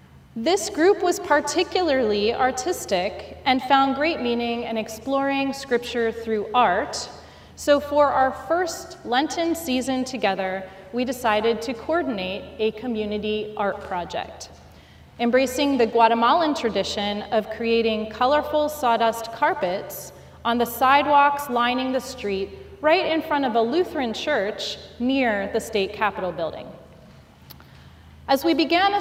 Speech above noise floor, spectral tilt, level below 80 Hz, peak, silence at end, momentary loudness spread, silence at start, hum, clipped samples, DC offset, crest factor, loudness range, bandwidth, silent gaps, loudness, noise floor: 26 dB; -3.5 dB/octave; -52 dBFS; -2 dBFS; 0 s; 11 LU; 0.15 s; none; under 0.1%; under 0.1%; 20 dB; 5 LU; 16 kHz; none; -22 LUFS; -48 dBFS